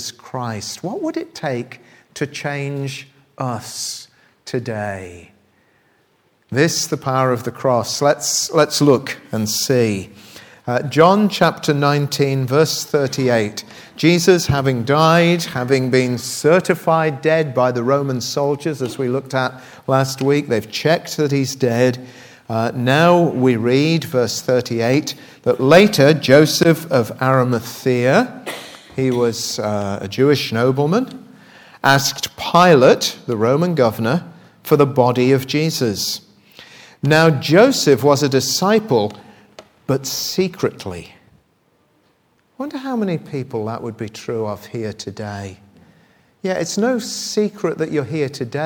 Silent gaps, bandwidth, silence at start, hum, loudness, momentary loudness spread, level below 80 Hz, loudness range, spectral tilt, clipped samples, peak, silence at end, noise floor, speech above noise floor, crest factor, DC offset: none; over 20 kHz; 0 s; none; -17 LUFS; 14 LU; -56 dBFS; 11 LU; -5 dB/octave; under 0.1%; 0 dBFS; 0 s; -60 dBFS; 43 dB; 18 dB; under 0.1%